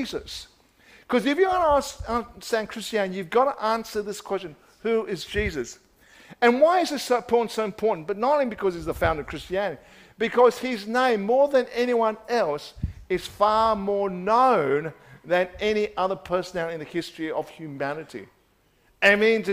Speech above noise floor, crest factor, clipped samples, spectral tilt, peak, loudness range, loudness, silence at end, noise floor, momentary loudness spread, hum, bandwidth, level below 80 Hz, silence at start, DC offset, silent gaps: 39 dB; 20 dB; under 0.1%; -4.5 dB/octave; -6 dBFS; 4 LU; -24 LUFS; 0 s; -63 dBFS; 12 LU; none; 16 kHz; -48 dBFS; 0 s; under 0.1%; none